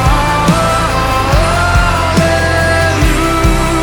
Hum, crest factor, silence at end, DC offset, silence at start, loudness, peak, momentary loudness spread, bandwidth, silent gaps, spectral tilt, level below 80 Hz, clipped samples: none; 10 dB; 0 s; under 0.1%; 0 s; -11 LUFS; 0 dBFS; 1 LU; 19 kHz; none; -5 dB/octave; -18 dBFS; under 0.1%